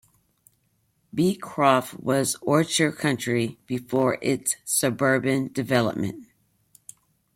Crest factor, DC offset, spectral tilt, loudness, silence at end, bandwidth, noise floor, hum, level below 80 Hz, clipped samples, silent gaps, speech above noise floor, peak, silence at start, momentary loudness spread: 20 dB; under 0.1%; -4.5 dB/octave; -24 LUFS; 1.1 s; 16.5 kHz; -69 dBFS; none; -64 dBFS; under 0.1%; none; 45 dB; -6 dBFS; 1.15 s; 8 LU